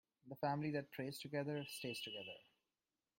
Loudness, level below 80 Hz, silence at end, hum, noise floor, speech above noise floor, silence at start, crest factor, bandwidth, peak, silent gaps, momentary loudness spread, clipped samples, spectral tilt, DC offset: -45 LUFS; -84 dBFS; 0.75 s; none; under -90 dBFS; over 45 dB; 0.25 s; 18 dB; 16.5 kHz; -28 dBFS; none; 11 LU; under 0.1%; -5 dB/octave; under 0.1%